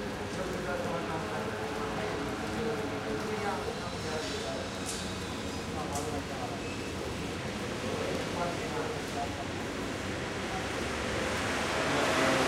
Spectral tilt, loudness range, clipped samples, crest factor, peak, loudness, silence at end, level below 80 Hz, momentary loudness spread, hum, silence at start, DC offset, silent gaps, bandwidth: -4 dB/octave; 2 LU; under 0.1%; 18 dB; -16 dBFS; -34 LUFS; 0 s; -50 dBFS; 5 LU; none; 0 s; under 0.1%; none; 16 kHz